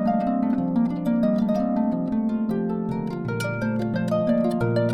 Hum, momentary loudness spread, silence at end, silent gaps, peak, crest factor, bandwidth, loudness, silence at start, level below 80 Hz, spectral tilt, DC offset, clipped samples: none; 5 LU; 0 s; none; -12 dBFS; 12 dB; 12.5 kHz; -24 LUFS; 0 s; -52 dBFS; -8.5 dB/octave; under 0.1%; under 0.1%